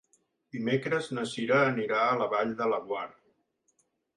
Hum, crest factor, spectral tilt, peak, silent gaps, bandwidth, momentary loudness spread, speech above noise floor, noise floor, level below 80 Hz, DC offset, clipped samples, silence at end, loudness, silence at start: none; 18 dB; -5.5 dB/octave; -14 dBFS; none; 11 kHz; 11 LU; 45 dB; -73 dBFS; -74 dBFS; under 0.1%; under 0.1%; 1.05 s; -29 LUFS; 0.55 s